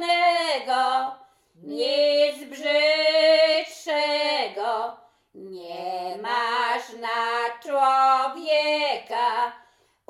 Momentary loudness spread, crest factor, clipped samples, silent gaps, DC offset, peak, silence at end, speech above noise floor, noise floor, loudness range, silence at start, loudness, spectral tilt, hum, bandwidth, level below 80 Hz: 12 LU; 16 dB; under 0.1%; none; under 0.1%; -8 dBFS; 0.5 s; 34 dB; -59 dBFS; 6 LU; 0 s; -23 LUFS; -1.5 dB/octave; none; 13 kHz; -80 dBFS